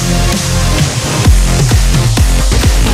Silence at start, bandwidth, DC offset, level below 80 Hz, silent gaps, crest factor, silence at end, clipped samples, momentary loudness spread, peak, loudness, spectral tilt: 0 s; 16 kHz; under 0.1%; -12 dBFS; none; 10 dB; 0 s; 0.2%; 2 LU; 0 dBFS; -11 LUFS; -4.5 dB/octave